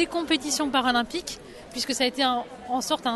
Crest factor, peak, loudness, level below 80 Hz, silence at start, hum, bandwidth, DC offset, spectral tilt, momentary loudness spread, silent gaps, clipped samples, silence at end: 18 dB; -10 dBFS; -25 LUFS; -56 dBFS; 0 s; none; 12.5 kHz; under 0.1%; -1.5 dB/octave; 11 LU; none; under 0.1%; 0 s